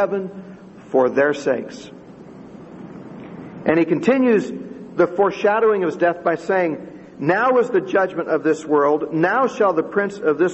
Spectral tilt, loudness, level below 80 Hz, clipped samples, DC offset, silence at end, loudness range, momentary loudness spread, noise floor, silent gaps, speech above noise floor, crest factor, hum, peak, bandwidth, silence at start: -6.5 dB/octave; -19 LUFS; -62 dBFS; under 0.1%; under 0.1%; 0 s; 4 LU; 21 LU; -40 dBFS; none; 21 dB; 18 dB; none; -2 dBFS; 8.4 kHz; 0 s